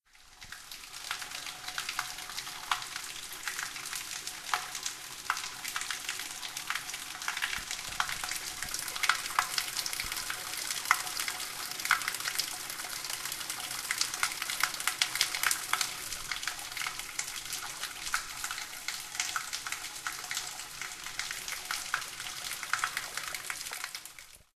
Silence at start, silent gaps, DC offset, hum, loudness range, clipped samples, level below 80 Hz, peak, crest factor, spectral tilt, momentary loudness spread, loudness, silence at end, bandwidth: 0.15 s; none; under 0.1%; none; 5 LU; under 0.1%; -62 dBFS; -6 dBFS; 30 dB; 1.5 dB/octave; 9 LU; -34 LUFS; 0.15 s; 14.5 kHz